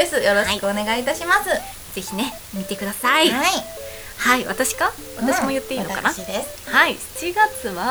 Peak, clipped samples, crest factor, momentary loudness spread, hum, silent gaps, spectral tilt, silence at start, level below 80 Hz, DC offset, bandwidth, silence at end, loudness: 0 dBFS; under 0.1%; 20 dB; 11 LU; none; none; -2.5 dB/octave; 0 s; -46 dBFS; under 0.1%; over 20 kHz; 0 s; -20 LUFS